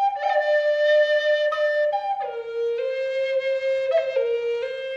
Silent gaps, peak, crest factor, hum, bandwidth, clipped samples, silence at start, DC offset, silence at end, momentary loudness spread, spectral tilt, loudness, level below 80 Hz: none; -10 dBFS; 12 dB; none; 7.4 kHz; under 0.1%; 0 s; under 0.1%; 0 s; 8 LU; -0.5 dB/octave; -22 LUFS; -72 dBFS